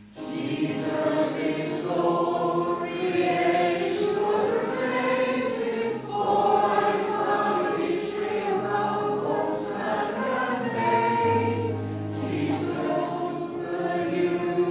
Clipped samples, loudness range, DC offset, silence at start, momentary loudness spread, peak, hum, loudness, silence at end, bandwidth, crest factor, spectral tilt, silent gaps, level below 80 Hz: under 0.1%; 2 LU; under 0.1%; 0 s; 6 LU; -8 dBFS; none; -26 LUFS; 0 s; 4 kHz; 16 dB; -10.5 dB/octave; none; -62 dBFS